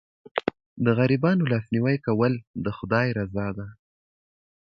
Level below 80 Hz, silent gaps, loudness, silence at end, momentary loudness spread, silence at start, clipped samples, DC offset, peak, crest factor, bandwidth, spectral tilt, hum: -54 dBFS; 0.66-0.76 s, 2.47-2.54 s; -25 LUFS; 0.95 s; 11 LU; 0.35 s; under 0.1%; under 0.1%; -6 dBFS; 20 dB; 6.2 kHz; -9.5 dB/octave; none